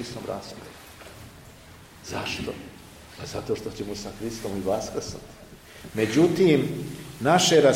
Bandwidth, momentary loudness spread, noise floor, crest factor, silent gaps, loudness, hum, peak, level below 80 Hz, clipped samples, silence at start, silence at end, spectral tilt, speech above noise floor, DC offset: 16.5 kHz; 24 LU; -48 dBFS; 20 dB; none; -25 LUFS; none; -6 dBFS; -52 dBFS; under 0.1%; 0 s; 0 s; -4.5 dB/octave; 23 dB; under 0.1%